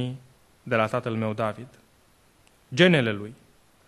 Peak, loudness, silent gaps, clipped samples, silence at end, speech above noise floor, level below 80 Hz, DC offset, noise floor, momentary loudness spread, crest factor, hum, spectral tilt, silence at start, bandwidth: -4 dBFS; -24 LUFS; none; under 0.1%; 0.55 s; 36 dB; -64 dBFS; under 0.1%; -60 dBFS; 23 LU; 22 dB; none; -6 dB/octave; 0 s; 12.5 kHz